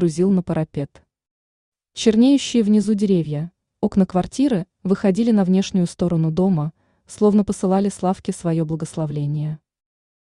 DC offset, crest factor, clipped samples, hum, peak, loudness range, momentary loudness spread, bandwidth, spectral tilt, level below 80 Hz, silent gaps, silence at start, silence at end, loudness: under 0.1%; 16 dB; under 0.1%; none; -2 dBFS; 2 LU; 10 LU; 11 kHz; -7 dB/octave; -52 dBFS; 1.31-1.72 s; 0 s; 0.7 s; -20 LUFS